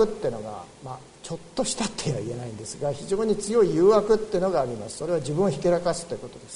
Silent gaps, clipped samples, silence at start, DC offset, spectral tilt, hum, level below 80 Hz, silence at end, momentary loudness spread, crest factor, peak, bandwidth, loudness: none; under 0.1%; 0 s; under 0.1%; -5.5 dB/octave; none; -50 dBFS; 0 s; 18 LU; 18 dB; -8 dBFS; 11 kHz; -25 LUFS